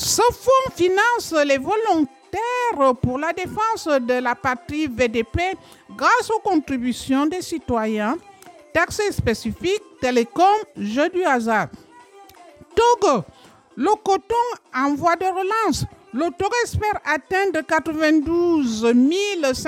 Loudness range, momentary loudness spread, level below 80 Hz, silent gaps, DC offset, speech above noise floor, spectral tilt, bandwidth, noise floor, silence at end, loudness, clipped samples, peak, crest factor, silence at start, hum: 3 LU; 7 LU; -46 dBFS; none; under 0.1%; 26 dB; -4.5 dB/octave; 17 kHz; -46 dBFS; 0 s; -20 LUFS; under 0.1%; -6 dBFS; 14 dB; 0 s; none